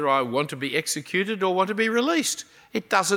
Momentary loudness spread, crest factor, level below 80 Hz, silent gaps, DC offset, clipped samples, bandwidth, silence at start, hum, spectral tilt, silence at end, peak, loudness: 7 LU; 18 dB; -74 dBFS; none; under 0.1%; under 0.1%; 18 kHz; 0 s; none; -3 dB/octave; 0 s; -6 dBFS; -24 LUFS